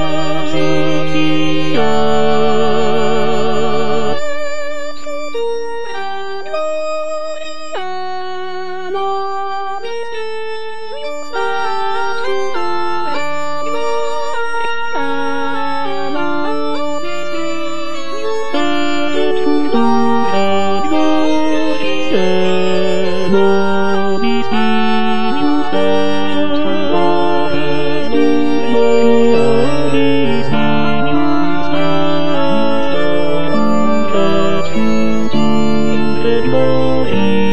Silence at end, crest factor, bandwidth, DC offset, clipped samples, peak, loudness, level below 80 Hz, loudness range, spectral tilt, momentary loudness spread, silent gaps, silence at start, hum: 0 s; 14 dB; 11 kHz; 30%; under 0.1%; 0 dBFS; -16 LUFS; -44 dBFS; 8 LU; -6 dB/octave; 9 LU; none; 0 s; none